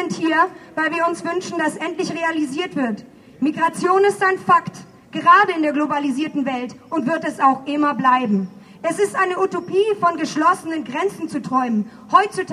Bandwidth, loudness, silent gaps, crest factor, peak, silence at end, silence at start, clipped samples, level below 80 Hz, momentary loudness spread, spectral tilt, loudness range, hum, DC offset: 13.5 kHz; -19 LUFS; none; 18 dB; 0 dBFS; 0 s; 0 s; under 0.1%; -66 dBFS; 8 LU; -5 dB/octave; 4 LU; none; under 0.1%